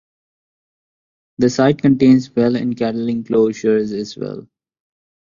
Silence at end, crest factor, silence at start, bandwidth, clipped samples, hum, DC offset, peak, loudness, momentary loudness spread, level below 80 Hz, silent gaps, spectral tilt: 0.85 s; 16 dB; 1.4 s; 7.4 kHz; under 0.1%; none; under 0.1%; -2 dBFS; -16 LUFS; 13 LU; -56 dBFS; none; -7 dB/octave